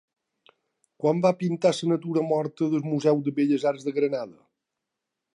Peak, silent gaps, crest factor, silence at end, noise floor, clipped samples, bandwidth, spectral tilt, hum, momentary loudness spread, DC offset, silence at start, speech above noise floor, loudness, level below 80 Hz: -8 dBFS; none; 18 dB; 1.05 s; -84 dBFS; under 0.1%; 11 kHz; -7 dB/octave; none; 4 LU; under 0.1%; 1 s; 60 dB; -25 LUFS; -76 dBFS